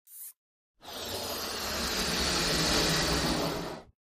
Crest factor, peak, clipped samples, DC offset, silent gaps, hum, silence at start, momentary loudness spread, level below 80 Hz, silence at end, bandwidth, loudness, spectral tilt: 16 dB; -16 dBFS; under 0.1%; under 0.1%; 0.36-0.74 s; none; 0.1 s; 19 LU; -46 dBFS; 0.3 s; 15.5 kHz; -29 LUFS; -2.5 dB/octave